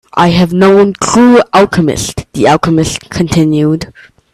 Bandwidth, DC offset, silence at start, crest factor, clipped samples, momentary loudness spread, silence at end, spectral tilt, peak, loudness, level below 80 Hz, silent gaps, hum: 14 kHz; under 0.1%; 0.15 s; 10 dB; under 0.1%; 10 LU; 0.45 s; -5.5 dB/octave; 0 dBFS; -9 LUFS; -36 dBFS; none; none